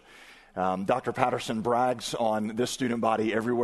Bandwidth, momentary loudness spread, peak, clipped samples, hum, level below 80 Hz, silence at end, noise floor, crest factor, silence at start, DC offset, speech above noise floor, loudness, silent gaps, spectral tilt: 12.5 kHz; 4 LU; -6 dBFS; under 0.1%; none; -62 dBFS; 0 s; -52 dBFS; 22 dB; 0.1 s; under 0.1%; 25 dB; -28 LUFS; none; -5 dB/octave